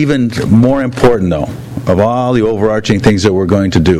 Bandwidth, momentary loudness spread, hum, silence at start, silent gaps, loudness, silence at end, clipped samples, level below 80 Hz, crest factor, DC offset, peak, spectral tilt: 14 kHz; 5 LU; none; 0 s; none; -11 LUFS; 0 s; 0.5%; -32 dBFS; 10 dB; under 0.1%; 0 dBFS; -7 dB/octave